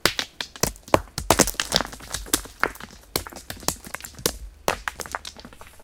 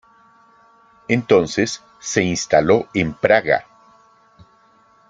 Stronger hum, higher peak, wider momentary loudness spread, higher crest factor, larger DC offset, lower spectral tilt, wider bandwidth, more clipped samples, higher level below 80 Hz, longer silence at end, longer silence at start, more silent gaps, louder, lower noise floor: neither; about the same, 0 dBFS vs 0 dBFS; first, 16 LU vs 8 LU; first, 28 dB vs 20 dB; neither; second, -2 dB/octave vs -4.5 dB/octave; first, 19 kHz vs 9.4 kHz; neither; first, -42 dBFS vs -52 dBFS; second, 0 s vs 1.5 s; second, 0.05 s vs 1.1 s; neither; second, -25 LUFS vs -18 LUFS; second, -44 dBFS vs -54 dBFS